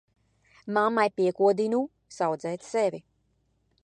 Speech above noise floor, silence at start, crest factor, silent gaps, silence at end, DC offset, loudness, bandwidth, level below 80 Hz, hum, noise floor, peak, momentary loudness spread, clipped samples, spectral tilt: 45 dB; 0.65 s; 18 dB; none; 0.85 s; under 0.1%; -27 LUFS; 9.6 kHz; -74 dBFS; none; -71 dBFS; -10 dBFS; 11 LU; under 0.1%; -5.5 dB/octave